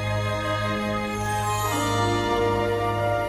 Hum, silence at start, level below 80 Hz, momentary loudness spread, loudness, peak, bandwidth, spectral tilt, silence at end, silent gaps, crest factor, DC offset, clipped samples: none; 0 s; -42 dBFS; 3 LU; -24 LUFS; -12 dBFS; 15.5 kHz; -5 dB/octave; 0 s; none; 14 dB; under 0.1%; under 0.1%